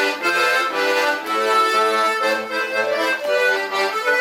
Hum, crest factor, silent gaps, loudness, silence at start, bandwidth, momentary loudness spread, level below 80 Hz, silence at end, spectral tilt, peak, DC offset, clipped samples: none; 12 dB; none; -18 LUFS; 0 s; 16.5 kHz; 4 LU; -76 dBFS; 0 s; -1 dB/octave; -6 dBFS; under 0.1%; under 0.1%